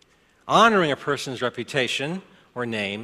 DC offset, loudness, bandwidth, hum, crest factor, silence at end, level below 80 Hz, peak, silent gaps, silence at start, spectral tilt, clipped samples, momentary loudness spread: under 0.1%; -22 LUFS; 14.5 kHz; none; 22 dB; 0 s; -64 dBFS; -2 dBFS; none; 0.45 s; -4 dB/octave; under 0.1%; 17 LU